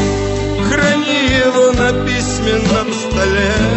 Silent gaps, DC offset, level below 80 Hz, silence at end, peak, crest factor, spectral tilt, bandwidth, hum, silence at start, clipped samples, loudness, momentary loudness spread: none; under 0.1%; -26 dBFS; 0 s; -2 dBFS; 12 dB; -4.5 dB/octave; 8.4 kHz; none; 0 s; under 0.1%; -14 LUFS; 5 LU